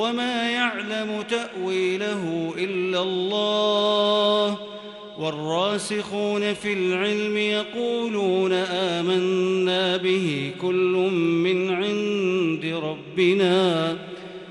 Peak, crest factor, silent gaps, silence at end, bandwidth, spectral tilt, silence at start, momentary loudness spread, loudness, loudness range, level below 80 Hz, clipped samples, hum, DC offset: -8 dBFS; 14 dB; none; 0 s; 11.5 kHz; -5 dB/octave; 0 s; 8 LU; -23 LUFS; 3 LU; -68 dBFS; under 0.1%; none; under 0.1%